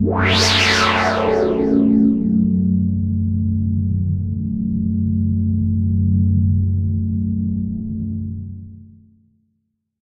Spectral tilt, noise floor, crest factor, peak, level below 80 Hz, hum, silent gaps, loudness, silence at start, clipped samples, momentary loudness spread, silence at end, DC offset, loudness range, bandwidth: -6 dB/octave; -71 dBFS; 16 dB; -2 dBFS; -38 dBFS; none; none; -18 LUFS; 0 s; under 0.1%; 11 LU; 1.15 s; under 0.1%; 6 LU; 11 kHz